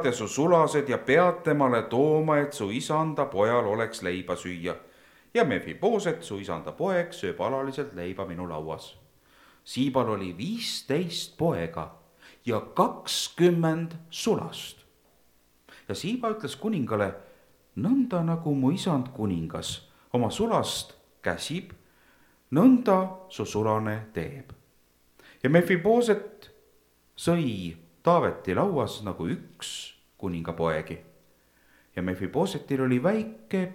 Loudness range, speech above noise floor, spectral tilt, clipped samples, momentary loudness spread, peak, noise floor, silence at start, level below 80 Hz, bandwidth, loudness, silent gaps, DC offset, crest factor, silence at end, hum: 6 LU; 37 dB; -5.5 dB/octave; under 0.1%; 14 LU; -6 dBFS; -64 dBFS; 0 s; -60 dBFS; 16.5 kHz; -27 LUFS; none; under 0.1%; 22 dB; 0 s; none